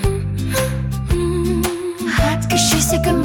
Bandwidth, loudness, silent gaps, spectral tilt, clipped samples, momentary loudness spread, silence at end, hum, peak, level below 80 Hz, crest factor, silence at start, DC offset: 19 kHz; -18 LUFS; none; -4.5 dB/octave; under 0.1%; 7 LU; 0 s; none; -2 dBFS; -26 dBFS; 14 dB; 0 s; under 0.1%